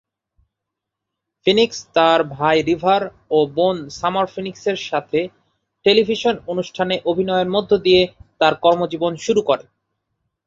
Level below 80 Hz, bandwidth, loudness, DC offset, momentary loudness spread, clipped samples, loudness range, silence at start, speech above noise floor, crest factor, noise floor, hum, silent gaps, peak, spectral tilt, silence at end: -54 dBFS; 7.8 kHz; -18 LUFS; under 0.1%; 8 LU; under 0.1%; 3 LU; 1.45 s; 64 dB; 18 dB; -82 dBFS; none; none; -2 dBFS; -5 dB/octave; 0.85 s